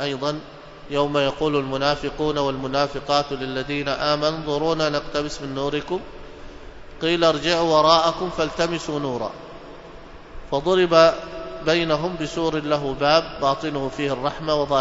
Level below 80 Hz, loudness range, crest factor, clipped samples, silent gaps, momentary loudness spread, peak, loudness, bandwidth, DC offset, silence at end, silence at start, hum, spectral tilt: -44 dBFS; 4 LU; 20 dB; under 0.1%; none; 17 LU; -2 dBFS; -22 LUFS; 8 kHz; under 0.1%; 0 s; 0 s; none; -5 dB/octave